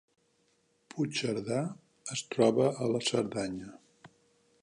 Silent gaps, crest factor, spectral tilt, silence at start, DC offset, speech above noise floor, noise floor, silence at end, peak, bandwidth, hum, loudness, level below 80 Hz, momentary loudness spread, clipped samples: none; 22 dB; -5 dB/octave; 0.95 s; under 0.1%; 41 dB; -72 dBFS; 0.55 s; -12 dBFS; 11 kHz; none; -31 LUFS; -70 dBFS; 17 LU; under 0.1%